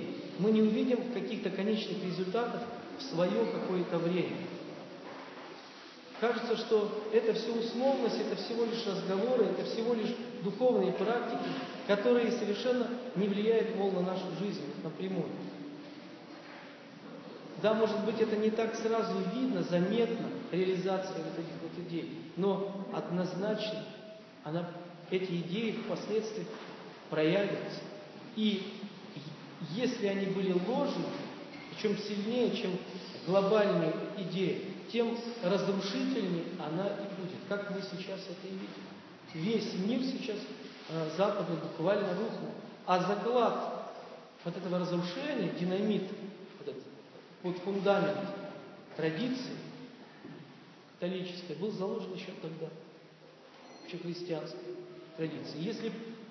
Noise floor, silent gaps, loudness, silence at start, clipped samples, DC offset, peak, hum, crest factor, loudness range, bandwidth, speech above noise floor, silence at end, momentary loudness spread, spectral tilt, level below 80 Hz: -56 dBFS; none; -34 LUFS; 0 s; under 0.1%; under 0.1%; -16 dBFS; none; 18 dB; 8 LU; 6.6 kHz; 23 dB; 0 s; 17 LU; -6.5 dB/octave; -86 dBFS